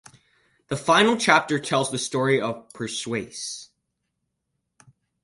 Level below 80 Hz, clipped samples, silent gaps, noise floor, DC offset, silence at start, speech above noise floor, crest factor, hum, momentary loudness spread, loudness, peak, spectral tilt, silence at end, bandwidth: -62 dBFS; under 0.1%; none; -78 dBFS; under 0.1%; 0.7 s; 56 dB; 22 dB; none; 15 LU; -23 LUFS; -2 dBFS; -3.5 dB/octave; 1.6 s; 11.5 kHz